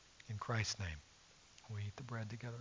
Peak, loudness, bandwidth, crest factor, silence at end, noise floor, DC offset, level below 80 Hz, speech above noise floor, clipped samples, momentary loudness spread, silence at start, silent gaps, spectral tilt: -26 dBFS; -44 LUFS; 7.6 kHz; 20 dB; 0 s; -64 dBFS; under 0.1%; -60 dBFS; 21 dB; under 0.1%; 22 LU; 0 s; none; -4 dB/octave